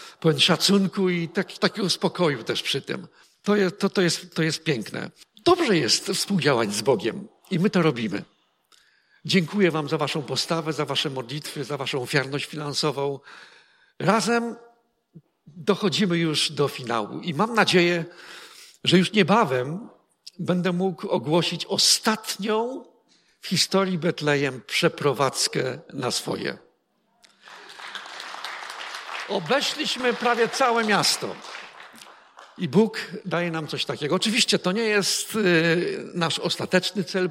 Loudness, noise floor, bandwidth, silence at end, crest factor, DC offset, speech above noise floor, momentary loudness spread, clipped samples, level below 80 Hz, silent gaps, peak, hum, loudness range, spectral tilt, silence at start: -23 LUFS; -68 dBFS; 16.5 kHz; 0 s; 20 dB; under 0.1%; 45 dB; 14 LU; under 0.1%; -70 dBFS; none; -4 dBFS; none; 5 LU; -4 dB/octave; 0 s